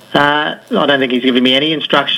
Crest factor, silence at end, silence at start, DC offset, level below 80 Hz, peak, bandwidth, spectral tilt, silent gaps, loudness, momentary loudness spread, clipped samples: 14 dB; 0 s; 0.1 s; under 0.1%; -56 dBFS; 0 dBFS; 13 kHz; -5 dB/octave; none; -12 LUFS; 5 LU; under 0.1%